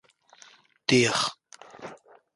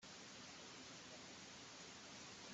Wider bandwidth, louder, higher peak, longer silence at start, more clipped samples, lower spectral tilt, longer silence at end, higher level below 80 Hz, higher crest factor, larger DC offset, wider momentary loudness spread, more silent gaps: first, 11.5 kHz vs 8.2 kHz; first, -24 LUFS vs -55 LUFS; first, -6 dBFS vs -44 dBFS; first, 0.9 s vs 0 s; neither; first, -3.5 dB/octave vs -2 dB/octave; first, 0.4 s vs 0 s; first, -68 dBFS vs -86 dBFS; first, 22 dB vs 14 dB; neither; first, 23 LU vs 1 LU; neither